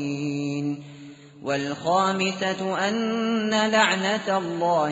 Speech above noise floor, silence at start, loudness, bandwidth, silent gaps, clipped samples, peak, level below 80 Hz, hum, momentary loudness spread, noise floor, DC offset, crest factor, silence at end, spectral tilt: 21 dB; 0 s; -24 LUFS; 8 kHz; none; under 0.1%; -4 dBFS; -68 dBFS; none; 10 LU; -44 dBFS; under 0.1%; 20 dB; 0 s; -3 dB/octave